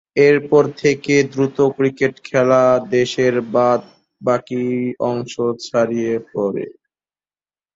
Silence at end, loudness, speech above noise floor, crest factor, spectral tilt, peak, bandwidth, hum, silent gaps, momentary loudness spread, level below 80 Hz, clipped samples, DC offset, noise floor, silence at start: 1.05 s; -17 LUFS; over 73 dB; 16 dB; -6 dB/octave; -2 dBFS; 7.8 kHz; none; none; 8 LU; -58 dBFS; under 0.1%; under 0.1%; under -90 dBFS; 0.15 s